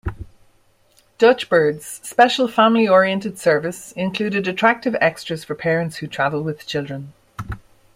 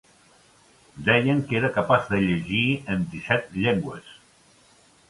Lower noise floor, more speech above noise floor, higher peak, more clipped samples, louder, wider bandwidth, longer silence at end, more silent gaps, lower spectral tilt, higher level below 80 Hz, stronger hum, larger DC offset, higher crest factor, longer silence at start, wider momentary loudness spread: about the same, -57 dBFS vs -57 dBFS; first, 39 dB vs 34 dB; about the same, -2 dBFS vs -4 dBFS; neither; first, -18 LUFS vs -23 LUFS; first, 16 kHz vs 11.5 kHz; second, 0.4 s vs 0.95 s; neither; second, -5 dB/octave vs -7 dB/octave; first, -46 dBFS vs -52 dBFS; neither; neither; about the same, 18 dB vs 22 dB; second, 0.05 s vs 0.95 s; first, 18 LU vs 7 LU